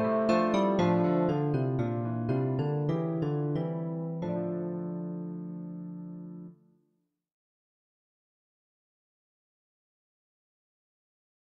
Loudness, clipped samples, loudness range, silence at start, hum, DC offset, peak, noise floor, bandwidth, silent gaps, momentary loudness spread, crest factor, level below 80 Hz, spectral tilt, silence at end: -30 LUFS; under 0.1%; 18 LU; 0 s; none; under 0.1%; -12 dBFS; -77 dBFS; 7.4 kHz; none; 15 LU; 20 dB; -66 dBFS; -9 dB/octave; 4.85 s